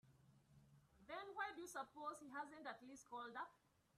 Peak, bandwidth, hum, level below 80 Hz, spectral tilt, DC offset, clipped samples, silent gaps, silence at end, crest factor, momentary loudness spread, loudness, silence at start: -34 dBFS; 13 kHz; none; -86 dBFS; -3 dB/octave; under 0.1%; under 0.1%; none; 0.4 s; 20 dB; 7 LU; -53 LUFS; 0.05 s